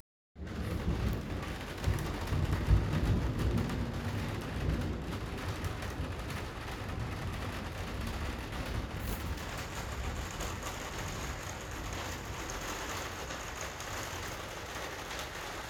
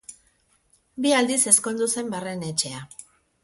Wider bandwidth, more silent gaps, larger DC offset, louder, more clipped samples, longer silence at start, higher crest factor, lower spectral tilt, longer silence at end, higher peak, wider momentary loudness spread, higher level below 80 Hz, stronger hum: first, over 20 kHz vs 12 kHz; neither; neither; second, -37 LUFS vs -22 LUFS; neither; first, 0.35 s vs 0.1 s; about the same, 22 dB vs 24 dB; first, -5 dB/octave vs -2.5 dB/octave; second, 0 s vs 0.4 s; second, -14 dBFS vs -2 dBFS; second, 7 LU vs 19 LU; first, -42 dBFS vs -66 dBFS; neither